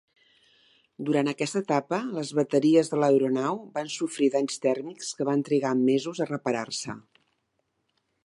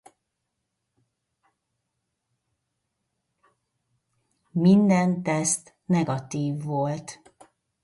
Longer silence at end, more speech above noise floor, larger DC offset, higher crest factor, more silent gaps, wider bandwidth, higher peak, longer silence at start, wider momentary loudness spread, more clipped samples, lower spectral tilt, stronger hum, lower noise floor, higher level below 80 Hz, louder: first, 1.25 s vs 0.7 s; second, 50 dB vs 58 dB; neither; about the same, 18 dB vs 20 dB; neither; about the same, 11.5 kHz vs 11.5 kHz; about the same, -8 dBFS vs -8 dBFS; second, 1 s vs 4.55 s; about the same, 11 LU vs 12 LU; neither; about the same, -5 dB/octave vs -6 dB/octave; neither; second, -76 dBFS vs -80 dBFS; second, -76 dBFS vs -68 dBFS; about the same, -26 LUFS vs -24 LUFS